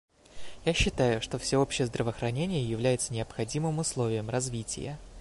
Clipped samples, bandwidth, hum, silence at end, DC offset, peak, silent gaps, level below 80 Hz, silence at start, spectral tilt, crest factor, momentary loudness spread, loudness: under 0.1%; 11.5 kHz; none; 0 s; under 0.1%; -12 dBFS; none; -46 dBFS; 0.3 s; -4.5 dB/octave; 18 dB; 7 LU; -30 LUFS